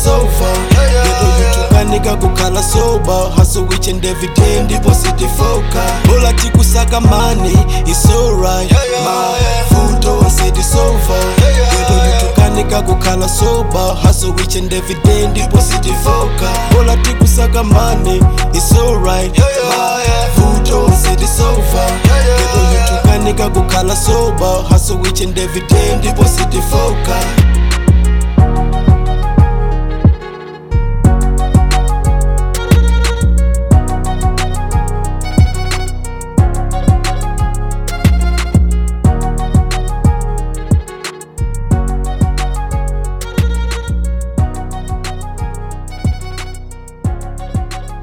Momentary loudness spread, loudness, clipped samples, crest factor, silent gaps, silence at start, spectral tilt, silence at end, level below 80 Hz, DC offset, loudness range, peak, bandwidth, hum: 9 LU; -12 LUFS; 1%; 10 dB; none; 0 s; -5 dB/octave; 0 s; -14 dBFS; 0.2%; 6 LU; 0 dBFS; 18 kHz; none